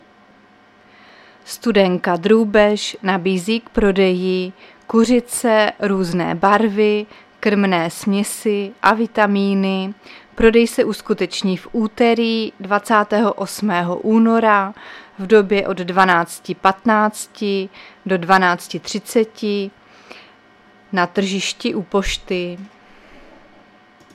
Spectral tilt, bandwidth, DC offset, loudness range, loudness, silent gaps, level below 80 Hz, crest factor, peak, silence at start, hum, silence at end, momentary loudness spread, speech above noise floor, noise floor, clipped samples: -5 dB/octave; 15 kHz; under 0.1%; 6 LU; -17 LUFS; none; -44 dBFS; 18 dB; 0 dBFS; 1.45 s; none; 1.45 s; 10 LU; 33 dB; -50 dBFS; under 0.1%